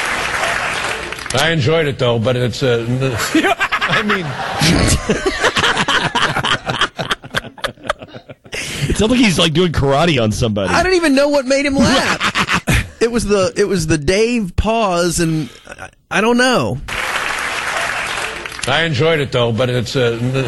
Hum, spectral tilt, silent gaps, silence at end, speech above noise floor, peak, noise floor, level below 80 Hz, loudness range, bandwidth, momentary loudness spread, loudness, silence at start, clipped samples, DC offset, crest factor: none; -4.5 dB/octave; none; 0 s; 21 dB; 0 dBFS; -36 dBFS; -32 dBFS; 3 LU; 12.5 kHz; 9 LU; -15 LUFS; 0 s; under 0.1%; under 0.1%; 16 dB